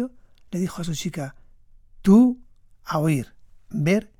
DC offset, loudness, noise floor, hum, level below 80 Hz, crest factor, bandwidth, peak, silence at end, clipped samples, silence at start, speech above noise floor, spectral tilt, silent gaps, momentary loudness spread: under 0.1%; -23 LUFS; -50 dBFS; none; -50 dBFS; 18 dB; 16 kHz; -6 dBFS; 0.15 s; under 0.1%; 0 s; 30 dB; -7 dB/octave; none; 20 LU